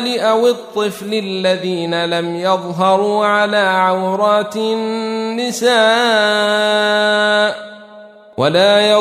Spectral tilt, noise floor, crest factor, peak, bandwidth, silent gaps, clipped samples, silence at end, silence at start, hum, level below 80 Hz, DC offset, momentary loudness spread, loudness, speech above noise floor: -4 dB/octave; -39 dBFS; 14 dB; -2 dBFS; 15 kHz; none; under 0.1%; 0 s; 0 s; none; -66 dBFS; under 0.1%; 8 LU; -14 LUFS; 24 dB